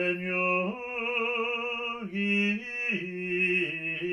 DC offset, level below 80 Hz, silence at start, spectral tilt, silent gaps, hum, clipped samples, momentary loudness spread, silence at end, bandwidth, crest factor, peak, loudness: under 0.1%; -70 dBFS; 0 s; -6 dB/octave; none; none; under 0.1%; 6 LU; 0 s; 10.5 kHz; 14 dB; -16 dBFS; -28 LUFS